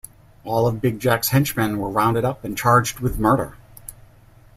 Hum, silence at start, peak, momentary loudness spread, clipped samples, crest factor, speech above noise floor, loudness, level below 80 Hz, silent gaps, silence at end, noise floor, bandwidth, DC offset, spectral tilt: none; 0.45 s; -2 dBFS; 22 LU; under 0.1%; 20 dB; 29 dB; -20 LUFS; -42 dBFS; none; 0.65 s; -49 dBFS; 16 kHz; under 0.1%; -5.5 dB/octave